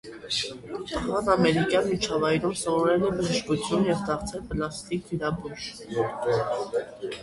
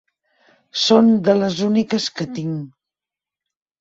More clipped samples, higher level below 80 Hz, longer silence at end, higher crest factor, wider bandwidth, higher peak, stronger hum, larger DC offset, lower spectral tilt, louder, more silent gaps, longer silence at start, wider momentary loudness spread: neither; first, -50 dBFS vs -62 dBFS; second, 0 s vs 1.15 s; about the same, 18 dB vs 18 dB; first, 11.5 kHz vs 7.8 kHz; second, -8 dBFS vs -2 dBFS; second, none vs 50 Hz at -45 dBFS; neither; about the same, -5 dB/octave vs -5.5 dB/octave; second, -27 LUFS vs -18 LUFS; neither; second, 0.05 s vs 0.75 s; second, 11 LU vs 15 LU